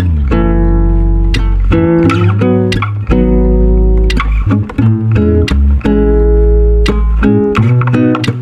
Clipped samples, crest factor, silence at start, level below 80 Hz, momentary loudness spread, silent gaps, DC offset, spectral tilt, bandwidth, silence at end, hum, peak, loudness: under 0.1%; 8 dB; 0 s; -12 dBFS; 3 LU; none; under 0.1%; -8 dB/octave; 8 kHz; 0 s; none; 0 dBFS; -11 LUFS